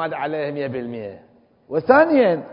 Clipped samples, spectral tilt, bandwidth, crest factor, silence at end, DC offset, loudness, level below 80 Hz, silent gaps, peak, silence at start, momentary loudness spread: under 0.1%; -11 dB/octave; 5.4 kHz; 20 dB; 0 s; under 0.1%; -19 LUFS; -60 dBFS; none; 0 dBFS; 0 s; 17 LU